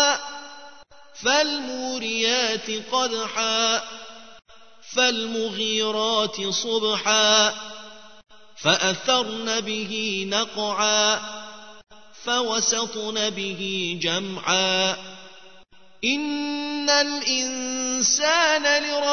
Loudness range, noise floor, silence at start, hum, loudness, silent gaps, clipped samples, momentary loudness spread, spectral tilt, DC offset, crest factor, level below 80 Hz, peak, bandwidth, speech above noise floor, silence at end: 3 LU; -52 dBFS; 0 s; none; -22 LUFS; none; under 0.1%; 12 LU; -1 dB/octave; 0.4%; 22 dB; -64 dBFS; -2 dBFS; 6.6 kHz; 29 dB; 0 s